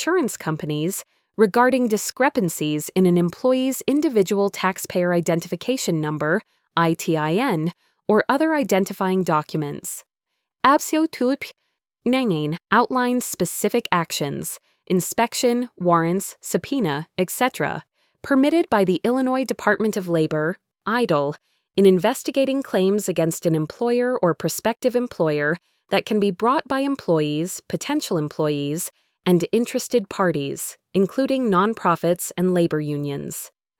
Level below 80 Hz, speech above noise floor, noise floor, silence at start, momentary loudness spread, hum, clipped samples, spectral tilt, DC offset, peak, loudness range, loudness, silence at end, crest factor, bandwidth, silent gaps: -62 dBFS; 59 dB; -80 dBFS; 0 s; 9 LU; none; under 0.1%; -5 dB/octave; under 0.1%; -2 dBFS; 2 LU; -21 LUFS; 0.35 s; 20 dB; 19.5 kHz; none